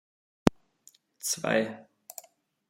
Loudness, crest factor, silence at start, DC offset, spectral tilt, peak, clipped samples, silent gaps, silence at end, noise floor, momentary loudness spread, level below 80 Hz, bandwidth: -29 LUFS; 30 dB; 0.45 s; under 0.1%; -4 dB/octave; -2 dBFS; under 0.1%; none; 0.9 s; -62 dBFS; 19 LU; -52 dBFS; 16.5 kHz